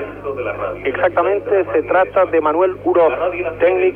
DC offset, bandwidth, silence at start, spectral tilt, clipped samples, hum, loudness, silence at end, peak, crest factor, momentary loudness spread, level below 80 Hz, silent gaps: under 0.1%; 4 kHz; 0 s; -8.5 dB/octave; under 0.1%; 50 Hz at -40 dBFS; -17 LUFS; 0 s; -2 dBFS; 14 dB; 8 LU; -46 dBFS; none